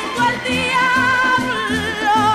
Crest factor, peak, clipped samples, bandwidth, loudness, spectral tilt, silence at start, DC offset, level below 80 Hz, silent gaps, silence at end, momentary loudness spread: 10 dB; -6 dBFS; under 0.1%; 16 kHz; -16 LUFS; -3.5 dB/octave; 0 s; under 0.1%; -44 dBFS; none; 0 s; 5 LU